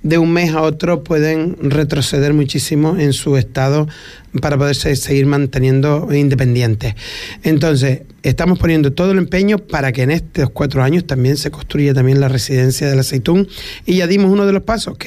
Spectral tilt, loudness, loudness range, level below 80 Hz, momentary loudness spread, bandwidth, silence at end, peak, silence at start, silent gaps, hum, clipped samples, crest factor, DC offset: -6.5 dB/octave; -14 LUFS; 1 LU; -34 dBFS; 7 LU; 15 kHz; 0 s; -2 dBFS; 0 s; none; none; under 0.1%; 10 dB; under 0.1%